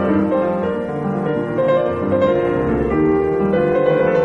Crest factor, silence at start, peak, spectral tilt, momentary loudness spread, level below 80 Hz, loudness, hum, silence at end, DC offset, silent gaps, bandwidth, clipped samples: 12 dB; 0 s; -6 dBFS; -9 dB/octave; 5 LU; -38 dBFS; -17 LUFS; none; 0 s; under 0.1%; none; 6 kHz; under 0.1%